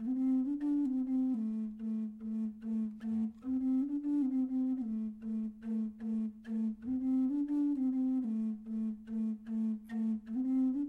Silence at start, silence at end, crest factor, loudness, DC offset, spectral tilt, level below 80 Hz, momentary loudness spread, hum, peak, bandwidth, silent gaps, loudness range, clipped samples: 0 s; 0 s; 8 dB; -35 LUFS; under 0.1%; -9.5 dB/octave; -68 dBFS; 6 LU; none; -26 dBFS; 3.4 kHz; none; 1 LU; under 0.1%